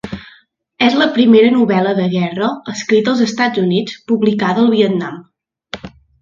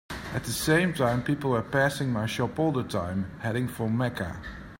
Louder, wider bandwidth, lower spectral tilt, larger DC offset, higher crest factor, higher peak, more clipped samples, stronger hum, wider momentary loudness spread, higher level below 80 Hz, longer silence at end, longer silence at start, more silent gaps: first, -14 LUFS vs -28 LUFS; second, 7.4 kHz vs 16.5 kHz; about the same, -6 dB/octave vs -5.5 dB/octave; neither; about the same, 14 dB vs 18 dB; first, 0 dBFS vs -10 dBFS; neither; neither; first, 20 LU vs 9 LU; about the same, -52 dBFS vs -50 dBFS; first, 0.35 s vs 0.05 s; about the same, 0.05 s vs 0.1 s; neither